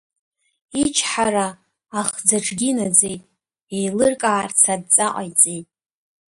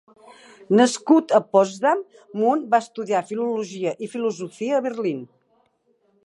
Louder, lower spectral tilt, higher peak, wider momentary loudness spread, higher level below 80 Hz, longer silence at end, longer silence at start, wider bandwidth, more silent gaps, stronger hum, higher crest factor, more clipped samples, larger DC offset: first, -18 LUFS vs -21 LUFS; second, -2.5 dB/octave vs -5 dB/octave; about the same, 0 dBFS vs -2 dBFS; about the same, 12 LU vs 10 LU; first, -58 dBFS vs -80 dBFS; second, 0.75 s vs 1 s; about the same, 0.75 s vs 0.7 s; about the same, 12 kHz vs 11.5 kHz; first, 3.63-3.67 s vs none; neither; about the same, 22 dB vs 20 dB; neither; neither